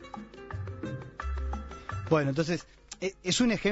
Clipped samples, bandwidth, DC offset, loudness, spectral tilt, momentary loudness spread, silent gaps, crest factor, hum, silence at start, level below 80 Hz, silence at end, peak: under 0.1%; 8 kHz; under 0.1%; -32 LUFS; -5 dB/octave; 15 LU; none; 20 dB; none; 0 s; -42 dBFS; 0 s; -12 dBFS